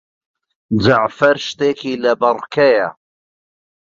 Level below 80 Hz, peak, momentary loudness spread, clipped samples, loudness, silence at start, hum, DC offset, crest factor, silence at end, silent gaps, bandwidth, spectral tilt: -48 dBFS; -2 dBFS; 5 LU; under 0.1%; -16 LUFS; 0.7 s; none; under 0.1%; 16 dB; 0.95 s; none; 7.6 kHz; -6 dB/octave